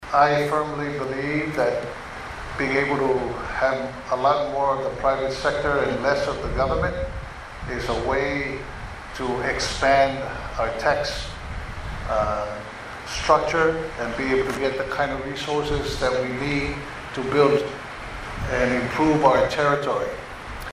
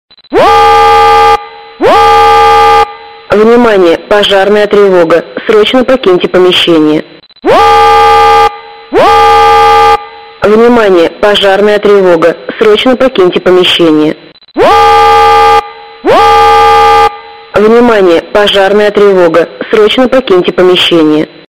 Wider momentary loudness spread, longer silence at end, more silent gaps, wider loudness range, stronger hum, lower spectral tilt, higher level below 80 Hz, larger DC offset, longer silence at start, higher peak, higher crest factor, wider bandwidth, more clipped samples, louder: first, 15 LU vs 7 LU; second, 0 s vs 0.2 s; neither; about the same, 3 LU vs 1 LU; neither; about the same, -5 dB/octave vs -4.5 dB/octave; second, -38 dBFS vs -32 dBFS; second, under 0.1% vs 2%; second, 0 s vs 0.3 s; about the same, -2 dBFS vs 0 dBFS; first, 20 dB vs 4 dB; about the same, 15 kHz vs 16 kHz; second, under 0.1% vs 8%; second, -23 LUFS vs -5 LUFS